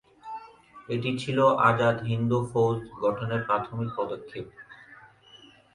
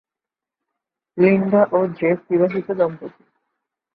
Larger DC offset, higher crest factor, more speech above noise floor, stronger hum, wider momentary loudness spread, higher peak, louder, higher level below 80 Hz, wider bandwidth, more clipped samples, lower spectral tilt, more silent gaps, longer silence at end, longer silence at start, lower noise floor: neither; about the same, 20 dB vs 18 dB; second, 28 dB vs 70 dB; neither; first, 20 LU vs 17 LU; second, -6 dBFS vs -2 dBFS; second, -26 LUFS vs -18 LUFS; about the same, -60 dBFS vs -64 dBFS; first, 11 kHz vs 4.8 kHz; neither; second, -7 dB/octave vs -11.5 dB/octave; neither; second, 0.4 s vs 0.85 s; second, 0.25 s vs 1.15 s; second, -54 dBFS vs -88 dBFS